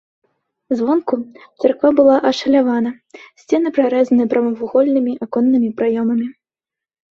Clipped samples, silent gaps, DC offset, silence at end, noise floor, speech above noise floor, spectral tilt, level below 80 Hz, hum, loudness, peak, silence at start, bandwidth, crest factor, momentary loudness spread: under 0.1%; none; under 0.1%; 0.8 s; -88 dBFS; 72 dB; -6 dB/octave; -62 dBFS; none; -16 LUFS; -2 dBFS; 0.7 s; 7.2 kHz; 16 dB; 11 LU